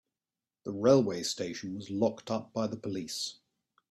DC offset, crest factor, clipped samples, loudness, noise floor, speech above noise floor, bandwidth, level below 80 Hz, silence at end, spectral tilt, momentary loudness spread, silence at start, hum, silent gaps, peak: under 0.1%; 22 dB; under 0.1%; -32 LUFS; under -90 dBFS; over 59 dB; 13.5 kHz; -72 dBFS; 0.6 s; -5 dB/octave; 14 LU; 0.65 s; none; none; -10 dBFS